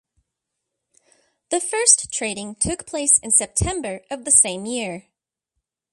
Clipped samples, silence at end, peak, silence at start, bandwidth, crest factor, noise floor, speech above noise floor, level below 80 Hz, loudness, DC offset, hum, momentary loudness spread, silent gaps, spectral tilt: under 0.1%; 0.95 s; 0 dBFS; 1.5 s; 12.5 kHz; 24 dB; -81 dBFS; 60 dB; -44 dBFS; -18 LUFS; under 0.1%; none; 15 LU; none; -2 dB/octave